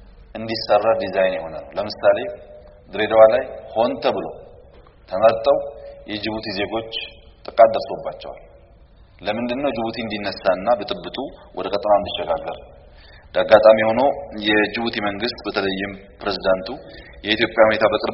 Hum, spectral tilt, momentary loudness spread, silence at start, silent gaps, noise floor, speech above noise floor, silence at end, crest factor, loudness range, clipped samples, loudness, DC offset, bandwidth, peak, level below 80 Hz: none; -2.5 dB/octave; 17 LU; 0.35 s; none; -48 dBFS; 29 dB; 0 s; 20 dB; 5 LU; under 0.1%; -20 LUFS; under 0.1%; 6 kHz; 0 dBFS; -48 dBFS